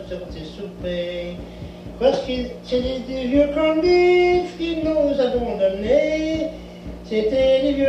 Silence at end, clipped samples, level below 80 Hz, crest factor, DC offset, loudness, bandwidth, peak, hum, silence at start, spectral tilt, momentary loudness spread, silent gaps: 0 s; under 0.1%; -40 dBFS; 16 dB; under 0.1%; -20 LUFS; 8.4 kHz; -4 dBFS; 60 Hz at -45 dBFS; 0 s; -6.5 dB/octave; 17 LU; none